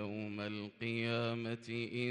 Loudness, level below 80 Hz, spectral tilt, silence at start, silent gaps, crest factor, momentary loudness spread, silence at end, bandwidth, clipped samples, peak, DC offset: -39 LUFS; -80 dBFS; -6.5 dB/octave; 0 s; none; 16 dB; 6 LU; 0 s; 10 kHz; under 0.1%; -24 dBFS; under 0.1%